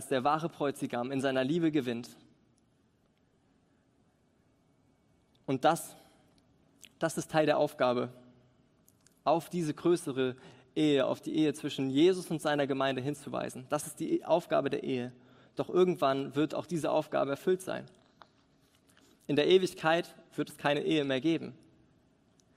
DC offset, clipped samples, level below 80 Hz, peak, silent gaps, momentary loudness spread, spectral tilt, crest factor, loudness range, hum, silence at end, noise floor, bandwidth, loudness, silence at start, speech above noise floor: under 0.1%; under 0.1%; -74 dBFS; -12 dBFS; none; 12 LU; -5.5 dB/octave; 20 dB; 7 LU; none; 1 s; -70 dBFS; 16 kHz; -31 LUFS; 0 s; 40 dB